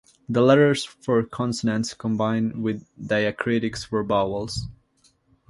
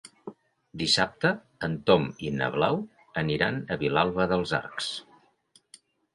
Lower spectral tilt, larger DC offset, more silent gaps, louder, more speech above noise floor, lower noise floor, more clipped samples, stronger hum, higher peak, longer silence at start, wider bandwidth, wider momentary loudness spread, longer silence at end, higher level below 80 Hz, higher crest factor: about the same, -6 dB/octave vs -5 dB/octave; neither; neither; first, -23 LUFS vs -27 LUFS; about the same, 40 dB vs 37 dB; about the same, -63 dBFS vs -64 dBFS; neither; neither; about the same, -4 dBFS vs -6 dBFS; first, 0.3 s vs 0.05 s; about the same, 11.5 kHz vs 11.5 kHz; about the same, 11 LU vs 12 LU; second, 0.75 s vs 1.1 s; first, -50 dBFS vs -56 dBFS; about the same, 20 dB vs 22 dB